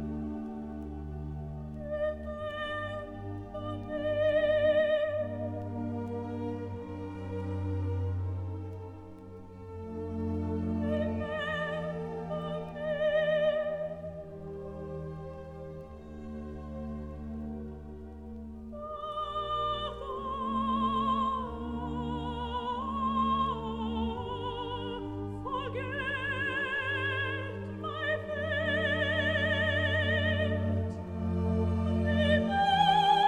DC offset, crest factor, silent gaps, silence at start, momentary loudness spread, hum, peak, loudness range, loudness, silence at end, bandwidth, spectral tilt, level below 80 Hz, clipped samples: under 0.1%; 18 dB; none; 0 s; 15 LU; none; -14 dBFS; 10 LU; -32 LUFS; 0 s; 9.8 kHz; -7 dB/octave; -48 dBFS; under 0.1%